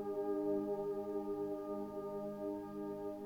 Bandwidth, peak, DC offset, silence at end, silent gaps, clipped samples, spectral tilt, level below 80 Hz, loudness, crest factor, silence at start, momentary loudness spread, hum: 17 kHz; -28 dBFS; under 0.1%; 0 s; none; under 0.1%; -8.5 dB/octave; -72 dBFS; -41 LUFS; 12 dB; 0 s; 6 LU; 50 Hz at -70 dBFS